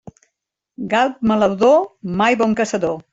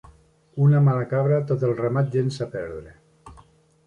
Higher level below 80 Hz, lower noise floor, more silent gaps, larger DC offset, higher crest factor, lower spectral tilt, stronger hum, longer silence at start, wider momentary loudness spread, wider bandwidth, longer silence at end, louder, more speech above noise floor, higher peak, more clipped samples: about the same, -54 dBFS vs -56 dBFS; first, -77 dBFS vs -54 dBFS; neither; neither; about the same, 16 dB vs 14 dB; second, -5.5 dB/octave vs -9 dB/octave; neither; first, 0.8 s vs 0.55 s; second, 8 LU vs 16 LU; about the same, 8 kHz vs 8.2 kHz; second, 0.1 s vs 0.55 s; first, -17 LUFS vs -22 LUFS; first, 60 dB vs 33 dB; first, -2 dBFS vs -10 dBFS; neither